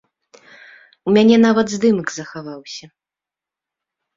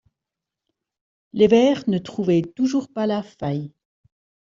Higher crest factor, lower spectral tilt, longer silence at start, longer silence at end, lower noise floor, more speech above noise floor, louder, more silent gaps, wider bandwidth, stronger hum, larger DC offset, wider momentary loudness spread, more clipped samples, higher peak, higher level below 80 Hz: about the same, 18 dB vs 18 dB; second, -5.5 dB/octave vs -7 dB/octave; second, 1.05 s vs 1.35 s; first, 1.35 s vs 0.75 s; about the same, -88 dBFS vs -86 dBFS; first, 72 dB vs 66 dB; first, -15 LUFS vs -21 LUFS; neither; about the same, 7.6 kHz vs 7.6 kHz; neither; neither; first, 20 LU vs 13 LU; neither; about the same, -2 dBFS vs -4 dBFS; about the same, -60 dBFS vs -60 dBFS